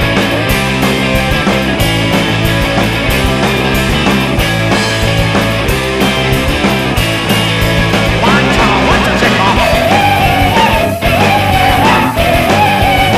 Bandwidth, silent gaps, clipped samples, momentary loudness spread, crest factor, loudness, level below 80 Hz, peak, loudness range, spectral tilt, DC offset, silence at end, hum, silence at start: 15.5 kHz; none; under 0.1%; 3 LU; 10 dB; -10 LUFS; -22 dBFS; 0 dBFS; 2 LU; -5 dB/octave; 0.5%; 0 s; none; 0 s